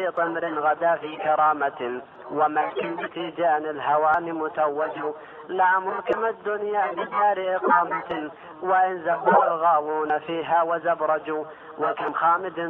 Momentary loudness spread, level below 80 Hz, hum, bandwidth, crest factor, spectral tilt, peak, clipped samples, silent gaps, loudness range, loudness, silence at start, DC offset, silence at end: 11 LU; -70 dBFS; none; 4.2 kHz; 18 dB; -7.5 dB/octave; -6 dBFS; under 0.1%; none; 2 LU; -24 LUFS; 0 s; under 0.1%; 0 s